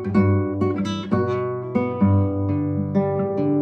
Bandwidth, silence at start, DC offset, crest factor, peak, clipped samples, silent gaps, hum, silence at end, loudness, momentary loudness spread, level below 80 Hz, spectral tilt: 6.4 kHz; 0 s; under 0.1%; 14 dB; -6 dBFS; under 0.1%; none; none; 0 s; -22 LUFS; 5 LU; -54 dBFS; -9 dB/octave